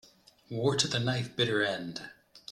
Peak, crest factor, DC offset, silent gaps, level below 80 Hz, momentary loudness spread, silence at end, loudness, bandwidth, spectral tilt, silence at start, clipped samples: -10 dBFS; 22 dB; under 0.1%; none; -66 dBFS; 16 LU; 0 s; -30 LUFS; 13.5 kHz; -4 dB/octave; 0.5 s; under 0.1%